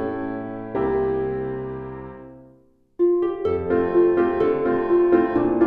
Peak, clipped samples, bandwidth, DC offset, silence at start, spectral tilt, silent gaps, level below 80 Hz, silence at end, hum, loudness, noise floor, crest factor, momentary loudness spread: -6 dBFS; under 0.1%; 4.2 kHz; under 0.1%; 0 s; -10.5 dB/octave; none; -48 dBFS; 0 s; none; -22 LUFS; -55 dBFS; 16 dB; 14 LU